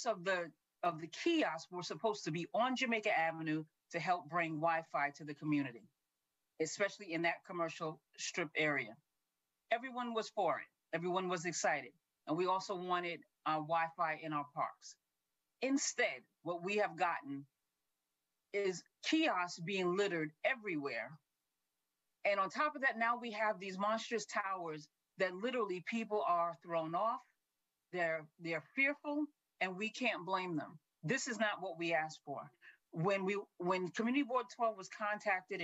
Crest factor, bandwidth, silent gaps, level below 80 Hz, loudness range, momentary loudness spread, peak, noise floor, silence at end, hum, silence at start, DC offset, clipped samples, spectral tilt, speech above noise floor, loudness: 20 dB; 8.8 kHz; none; under -90 dBFS; 2 LU; 10 LU; -20 dBFS; -89 dBFS; 0 s; none; 0 s; under 0.1%; under 0.1%; -4 dB/octave; 51 dB; -38 LUFS